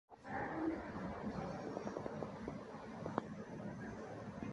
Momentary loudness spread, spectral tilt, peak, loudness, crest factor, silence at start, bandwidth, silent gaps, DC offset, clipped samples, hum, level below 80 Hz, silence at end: 7 LU; -7 dB/octave; -20 dBFS; -46 LUFS; 26 dB; 0.1 s; 11 kHz; none; under 0.1%; under 0.1%; none; -64 dBFS; 0 s